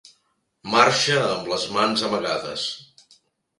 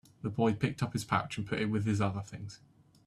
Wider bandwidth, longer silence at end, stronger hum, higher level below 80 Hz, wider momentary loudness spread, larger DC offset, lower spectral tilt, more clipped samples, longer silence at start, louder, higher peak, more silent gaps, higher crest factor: second, 11.5 kHz vs 13.5 kHz; first, 0.75 s vs 0.5 s; neither; about the same, -64 dBFS vs -62 dBFS; about the same, 12 LU vs 13 LU; neither; second, -3 dB/octave vs -6.5 dB/octave; neither; first, 0.65 s vs 0.25 s; first, -21 LUFS vs -33 LUFS; first, 0 dBFS vs -14 dBFS; neither; about the same, 24 dB vs 20 dB